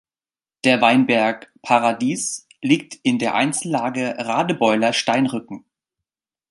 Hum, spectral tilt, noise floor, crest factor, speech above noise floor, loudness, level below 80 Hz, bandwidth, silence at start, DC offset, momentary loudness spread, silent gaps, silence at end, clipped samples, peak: none; -4 dB/octave; under -90 dBFS; 20 dB; over 71 dB; -19 LUFS; -68 dBFS; 11.5 kHz; 0.65 s; under 0.1%; 10 LU; none; 0.9 s; under 0.1%; -2 dBFS